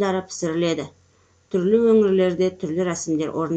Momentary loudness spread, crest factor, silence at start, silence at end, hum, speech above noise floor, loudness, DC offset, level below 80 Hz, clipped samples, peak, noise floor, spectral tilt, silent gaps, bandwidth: 10 LU; 14 dB; 0 s; 0 s; none; 38 dB; -21 LUFS; under 0.1%; -62 dBFS; under 0.1%; -6 dBFS; -59 dBFS; -6 dB/octave; none; 9 kHz